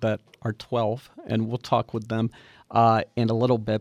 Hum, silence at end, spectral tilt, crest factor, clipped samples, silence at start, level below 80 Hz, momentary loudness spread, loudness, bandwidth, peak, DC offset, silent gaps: none; 0 s; -8 dB/octave; 18 dB; under 0.1%; 0 s; -60 dBFS; 10 LU; -25 LUFS; 10 kHz; -8 dBFS; under 0.1%; none